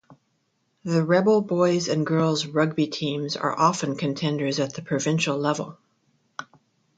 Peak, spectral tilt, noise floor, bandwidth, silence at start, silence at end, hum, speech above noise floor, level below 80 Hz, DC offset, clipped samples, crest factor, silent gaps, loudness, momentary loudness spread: -4 dBFS; -5.5 dB/octave; -71 dBFS; 9.2 kHz; 0.1 s; 0.55 s; none; 48 dB; -68 dBFS; under 0.1%; under 0.1%; 20 dB; none; -24 LUFS; 14 LU